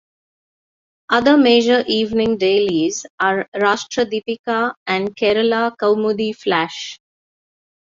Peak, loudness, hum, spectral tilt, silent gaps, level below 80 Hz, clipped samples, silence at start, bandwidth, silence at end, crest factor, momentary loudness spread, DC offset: -2 dBFS; -17 LUFS; none; -4 dB/octave; 3.10-3.18 s, 3.48-3.52 s, 4.39-4.44 s, 4.77-4.86 s; -56 dBFS; under 0.1%; 1.1 s; 7.6 kHz; 1 s; 16 dB; 9 LU; under 0.1%